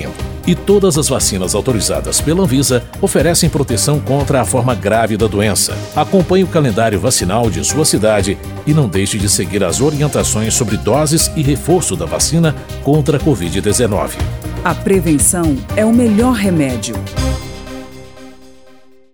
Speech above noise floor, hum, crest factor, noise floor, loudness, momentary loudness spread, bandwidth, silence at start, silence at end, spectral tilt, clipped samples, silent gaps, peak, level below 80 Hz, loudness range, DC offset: 32 dB; none; 14 dB; -46 dBFS; -14 LUFS; 8 LU; 19.5 kHz; 0 s; 0.8 s; -4.5 dB/octave; under 0.1%; none; 0 dBFS; -28 dBFS; 1 LU; 0.4%